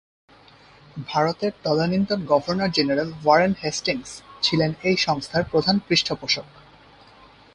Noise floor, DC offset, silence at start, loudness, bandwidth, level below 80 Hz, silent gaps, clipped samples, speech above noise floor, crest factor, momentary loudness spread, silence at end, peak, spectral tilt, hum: -51 dBFS; under 0.1%; 0.95 s; -22 LUFS; 11 kHz; -54 dBFS; none; under 0.1%; 29 dB; 20 dB; 7 LU; 1.1 s; -4 dBFS; -4.5 dB/octave; none